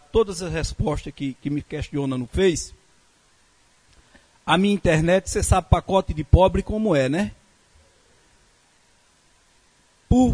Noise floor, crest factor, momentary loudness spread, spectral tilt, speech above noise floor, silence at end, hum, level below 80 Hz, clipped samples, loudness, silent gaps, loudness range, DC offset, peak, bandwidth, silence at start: -59 dBFS; 22 dB; 11 LU; -6 dB/octave; 39 dB; 0 s; none; -32 dBFS; under 0.1%; -22 LUFS; none; 8 LU; under 0.1%; 0 dBFS; 11 kHz; 0.15 s